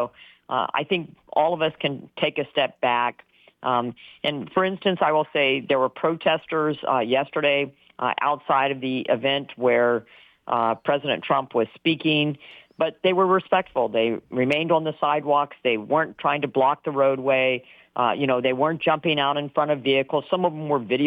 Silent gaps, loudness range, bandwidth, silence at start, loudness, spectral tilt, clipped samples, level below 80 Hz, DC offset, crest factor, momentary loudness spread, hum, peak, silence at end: none; 2 LU; 5.4 kHz; 0 s; -23 LUFS; -7.5 dB/octave; under 0.1%; -70 dBFS; under 0.1%; 14 dB; 6 LU; none; -8 dBFS; 0 s